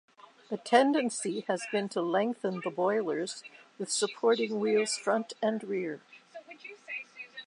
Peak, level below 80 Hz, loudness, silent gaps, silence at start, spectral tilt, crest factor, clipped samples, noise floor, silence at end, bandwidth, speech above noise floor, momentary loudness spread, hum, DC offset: -10 dBFS; -88 dBFS; -30 LUFS; none; 0.5 s; -3.5 dB/octave; 20 dB; under 0.1%; -50 dBFS; 0 s; 11 kHz; 20 dB; 19 LU; none; under 0.1%